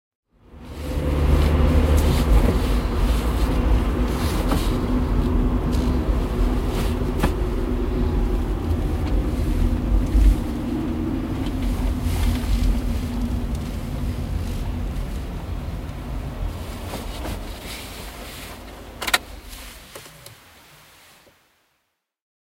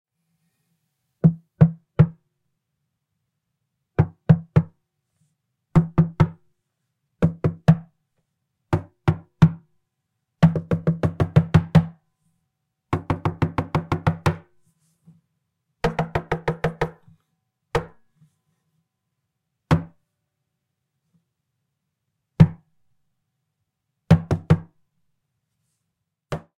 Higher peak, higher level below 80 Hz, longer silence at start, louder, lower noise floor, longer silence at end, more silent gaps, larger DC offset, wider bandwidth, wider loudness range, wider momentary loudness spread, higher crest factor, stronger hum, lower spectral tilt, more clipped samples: about the same, -2 dBFS vs 0 dBFS; first, -24 dBFS vs -46 dBFS; second, 0.5 s vs 1.25 s; about the same, -24 LUFS vs -22 LUFS; second, -73 dBFS vs -79 dBFS; first, 2.15 s vs 0.2 s; neither; neither; first, 16 kHz vs 8.2 kHz; about the same, 10 LU vs 9 LU; first, 15 LU vs 10 LU; about the same, 20 dB vs 24 dB; neither; second, -6.5 dB/octave vs -9 dB/octave; neither